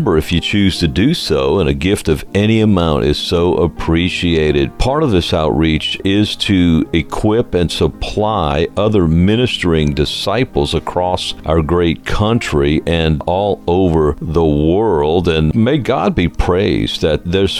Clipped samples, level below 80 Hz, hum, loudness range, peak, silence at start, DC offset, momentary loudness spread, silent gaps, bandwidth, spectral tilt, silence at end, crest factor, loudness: under 0.1%; -26 dBFS; none; 1 LU; 0 dBFS; 0 s; under 0.1%; 4 LU; none; 15 kHz; -6.5 dB/octave; 0 s; 14 dB; -14 LUFS